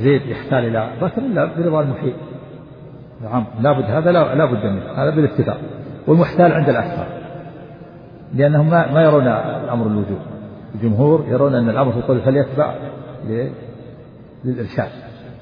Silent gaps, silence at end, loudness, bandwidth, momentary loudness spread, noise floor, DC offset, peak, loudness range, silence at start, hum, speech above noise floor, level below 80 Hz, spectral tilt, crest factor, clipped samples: none; 0 s; -17 LUFS; 5.2 kHz; 21 LU; -39 dBFS; under 0.1%; -2 dBFS; 5 LU; 0 s; none; 23 dB; -50 dBFS; -11 dB/octave; 16 dB; under 0.1%